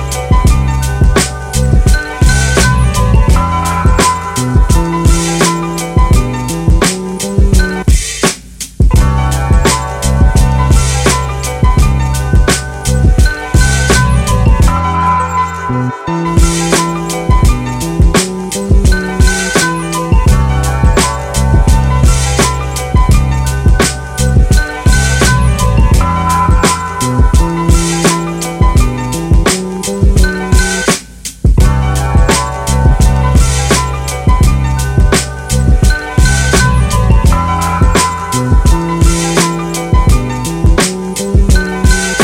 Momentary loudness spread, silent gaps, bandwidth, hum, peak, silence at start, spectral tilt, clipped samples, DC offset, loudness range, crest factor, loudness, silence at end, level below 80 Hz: 5 LU; none; 16 kHz; none; 0 dBFS; 0 s; -5 dB/octave; under 0.1%; under 0.1%; 1 LU; 10 dB; -11 LUFS; 0 s; -12 dBFS